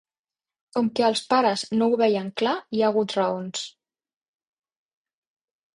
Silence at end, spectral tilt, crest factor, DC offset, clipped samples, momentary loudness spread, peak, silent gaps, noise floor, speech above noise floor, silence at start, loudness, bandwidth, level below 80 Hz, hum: 2.05 s; -4.5 dB/octave; 18 dB; under 0.1%; under 0.1%; 10 LU; -8 dBFS; none; under -90 dBFS; over 67 dB; 0.75 s; -23 LUFS; 11 kHz; -70 dBFS; none